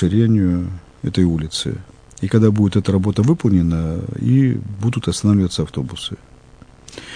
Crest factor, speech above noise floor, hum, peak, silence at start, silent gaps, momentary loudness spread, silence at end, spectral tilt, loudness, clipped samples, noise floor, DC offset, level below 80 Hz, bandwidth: 18 dB; 28 dB; none; 0 dBFS; 0 s; none; 13 LU; 0 s; -7 dB/octave; -18 LUFS; under 0.1%; -44 dBFS; under 0.1%; -38 dBFS; 10 kHz